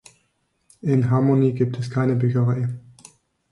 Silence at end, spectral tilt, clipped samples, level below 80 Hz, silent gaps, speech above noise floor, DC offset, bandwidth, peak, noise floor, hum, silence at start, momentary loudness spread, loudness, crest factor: 0.7 s; -9 dB/octave; under 0.1%; -58 dBFS; none; 50 dB; under 0.1%; 11.5 kHz; -6 dBFS; -69 dBFS; none; 0.85 s; 10 LU; -21 LUFS; 14 dB